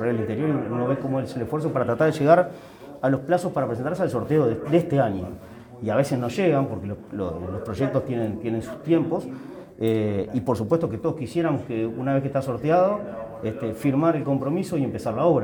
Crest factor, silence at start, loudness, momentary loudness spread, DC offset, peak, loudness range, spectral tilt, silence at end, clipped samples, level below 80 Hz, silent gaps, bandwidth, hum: 20 dB; 0 s; -24 LUFS; 11 LU; under 0.1%; -4 dBFS; 3 LU; -8 dB/octave; 0 s; under 0.1%; -56 dBFS; none; 19.5 kHz; none